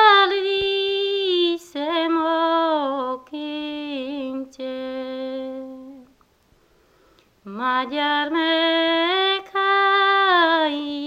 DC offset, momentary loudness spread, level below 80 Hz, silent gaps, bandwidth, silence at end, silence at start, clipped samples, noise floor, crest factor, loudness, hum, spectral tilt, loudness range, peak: under 0.1%; 14 LU; -64 dBFS; none; 8.8 kHz; 0 s; 0 s; under 0.1%; -59 dBFS; 20 dB; -21 LUFS; none; -3.5 dB/octave; 13 LU; -2 dBFS